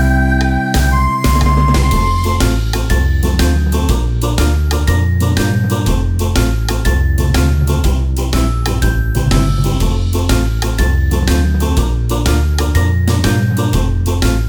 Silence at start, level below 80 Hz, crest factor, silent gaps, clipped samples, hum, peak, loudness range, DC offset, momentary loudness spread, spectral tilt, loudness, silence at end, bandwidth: 0 s; -16 dBFS; 12 dB; none; under 0.1%; none; 0 dBFS; 1 LU; under 0.1%; 3 LU; -5.5 dB/octave; -14 LUFS; 0 s; 20 kHz